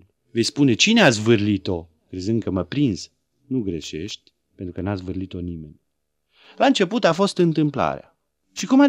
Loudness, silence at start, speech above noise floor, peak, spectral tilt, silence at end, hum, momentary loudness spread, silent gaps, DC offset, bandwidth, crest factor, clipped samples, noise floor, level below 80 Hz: -21 LUFS; 0.35 s; 56 dB; 0 dBFS; -5 dB/octave; 0 s; none; 19 LU; none; under 0.1%; 11.5 kHz; 22 dB; under 0.1%; -76 dBFS; -54 dBFS